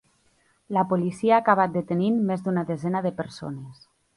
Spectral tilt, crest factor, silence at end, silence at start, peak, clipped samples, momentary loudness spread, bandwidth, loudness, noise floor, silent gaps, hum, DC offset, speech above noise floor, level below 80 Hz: -8 dB/octave; 20 dB; 0.45 s; 0.7 s; -4 dBFS; under 0.1%; 15 LU; 11.5 kHz; -24 LUFS; -65 dBFS; none; none; under 0.1%; 41 dB; -64 dBFS